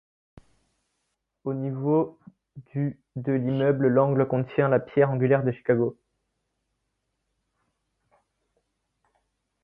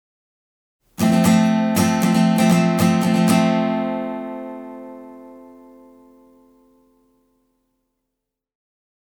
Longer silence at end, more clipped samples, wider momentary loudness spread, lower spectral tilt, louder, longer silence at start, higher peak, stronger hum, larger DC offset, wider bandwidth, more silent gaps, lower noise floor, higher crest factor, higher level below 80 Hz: about the same, 3.7 s vs 3.6 s; neither; second, 11 LU vs 20 LU; first, -11.5 dB/octave vs -6 dB/octave; second, -25 LUFS vs -17 LUFS; first, 1.45 s vs 1 s; second, -8 dBFS vs -2 dBFS; neither; neither; second, 3.9 kHz vs 19.5 kHz; neither; about the same, -79 dBFS vs -81 dBFS; about the same, 20 dB vs 18 dB; second, -66 dBFS vs -60 dBFS